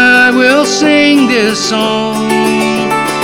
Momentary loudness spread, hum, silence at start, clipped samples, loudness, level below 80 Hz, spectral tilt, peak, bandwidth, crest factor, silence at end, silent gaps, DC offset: 6 LU; none; 0 s; under 0.1%; -9 LUFS; -46 dBFS; -3.5 dB/octave; 0 dBFS; 18 kHz; 10 dB; 0 s; none; under 0.1%